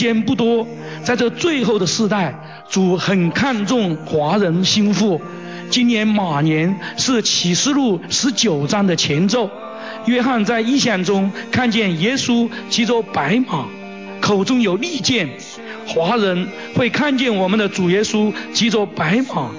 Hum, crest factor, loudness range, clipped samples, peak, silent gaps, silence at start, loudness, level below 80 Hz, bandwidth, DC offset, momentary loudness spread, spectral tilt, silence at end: none; 12 dB; 2 LU; under 0.1%; -4 dBFS; none; 0 s; -17 LUFS; -54 dBFS; 7.6 kHz; 0.3%; 8 LU; -4.5 dB/octave; 0 s